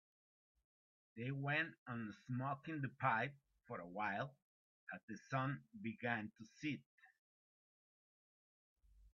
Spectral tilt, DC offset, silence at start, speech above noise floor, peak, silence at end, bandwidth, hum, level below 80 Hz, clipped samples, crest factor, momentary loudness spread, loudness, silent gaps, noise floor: -5 dB/octave; under 0.1%; 1.15 s; over 46 dB; -24 dBFS; 0.05 s; 7.2 kHz; none; -82 dBFS; under 0.1%; 22 dB; 13 LU; -45 LUFS; 1.78-1.86 s, 4.42-4.87 s, 5.03-5.08 s, 6.86-6.98 s, 7.19-8.76 s; under -90 dBFS